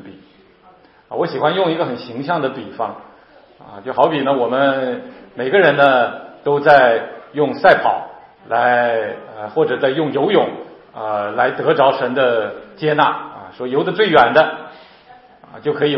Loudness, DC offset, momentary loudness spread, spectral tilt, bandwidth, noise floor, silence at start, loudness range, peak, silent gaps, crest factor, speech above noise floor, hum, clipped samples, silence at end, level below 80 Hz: -16 LUFS; under 0.1%; 16 LU; -7.5 dB/octave; 5.8 kHz; -48 dBFS; 0.05 s; 6 LU; 0 dBFS; none; 18 dB; 32 dB; none; under 0.1%; 0 s; -60 dBFS